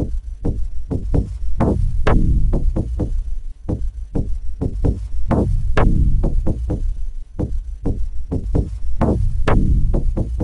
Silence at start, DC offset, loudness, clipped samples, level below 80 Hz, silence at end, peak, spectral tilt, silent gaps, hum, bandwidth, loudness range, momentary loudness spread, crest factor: 0 s; under 0.1%; -22 LUFS; under 0.1%; -20 dBFS; 0 s; 0 dBFS; -9 dB/octave; none; none; 5.8 kHz; 2 LU; 10 LU; 16 dB